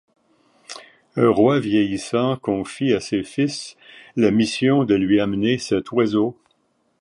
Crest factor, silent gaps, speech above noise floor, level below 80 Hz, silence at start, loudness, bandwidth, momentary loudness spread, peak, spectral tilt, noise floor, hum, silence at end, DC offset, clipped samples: 18 dB; none; 46 dB; -54 dBFS; 0.7 s; -20 LUFS; 11 kHz; 14 LU; -2 dBFS; -6 dB/octave; -66 dBFS; none; 0.7 s; under 0.1%; under 0.1%